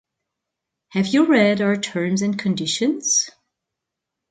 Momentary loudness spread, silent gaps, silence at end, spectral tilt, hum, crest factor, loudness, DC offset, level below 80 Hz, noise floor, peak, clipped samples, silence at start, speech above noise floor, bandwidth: 7 LU; none; 1 s; -3.5 dB/octave; none; 18 dB; -19 LUFS; under 0.1%; -66 dBFS; -83 dBFS; -4 dBFS; under 0.1%; 0.95 s; 64 dB; 9.4 kHz